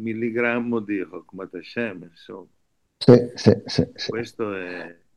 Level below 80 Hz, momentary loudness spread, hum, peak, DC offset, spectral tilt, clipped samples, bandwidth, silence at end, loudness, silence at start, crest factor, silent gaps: -58 dBFS; 24 LU; none; 0 dBFS; under 0.1%; -7 dB/octave; under 0.1%; 10 kHz; 0.25 s; -22 LUFS; 0 s; 22 dB; none